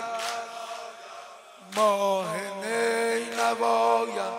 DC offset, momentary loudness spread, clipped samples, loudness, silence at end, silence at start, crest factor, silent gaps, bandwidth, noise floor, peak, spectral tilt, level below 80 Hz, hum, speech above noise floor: under 0.1%; 18 LU; under 0.1%; -26 LUFS; 0 s; 0 s; 16 dB; none; 16 kHz; -47 dBFS; -12 dBFS; -2.5 dB/octave; -80 dBFS; none; 23 dB